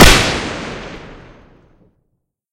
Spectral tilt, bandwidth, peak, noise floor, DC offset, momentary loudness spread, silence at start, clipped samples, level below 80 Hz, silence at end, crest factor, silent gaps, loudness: -3.5 dB/octave; over 20 kHz; 0 dBFS; -69 dBFS; under 0.1%; 24 LU; 0 s; 0.8%; -22 dBFS; 1.4 s; 16 dB; none; -14 LUFS